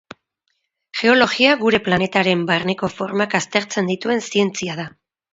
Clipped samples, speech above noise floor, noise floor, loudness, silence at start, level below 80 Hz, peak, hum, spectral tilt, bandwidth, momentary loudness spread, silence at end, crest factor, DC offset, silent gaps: under 0.1%; 54 dB; -72 dBFS; -18 LUFS; 0.95 s; -56 dBFS; 0 dBFS; none; -4.5 dB/octave; 8 kHz; 11 LU; 0.45 s; 20 dB; under 0.1%; none